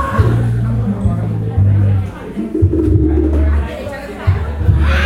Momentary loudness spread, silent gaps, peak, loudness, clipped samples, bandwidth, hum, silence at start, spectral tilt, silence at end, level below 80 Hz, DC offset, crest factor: 9 LU; none; 0 dBFS; -15 LUFS; under 0.1%; 10.5 kHz; none; 0 s; -8.5 dB/octave; 0 s; -20 dBFS; under 0.1%; 12 dB